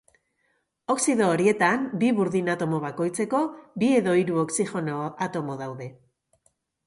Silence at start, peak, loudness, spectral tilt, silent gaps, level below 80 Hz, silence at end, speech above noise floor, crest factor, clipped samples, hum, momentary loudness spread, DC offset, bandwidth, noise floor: 0.9 s; -8 dBFS; -25 LUFS; -5.5 dB/octave; none; -68 dBFS; 0.95 s; 48 dB; 18 dB; under 0.1%; none; 11 LU; under 0.1%; 11.5 kHz; -72 dBFS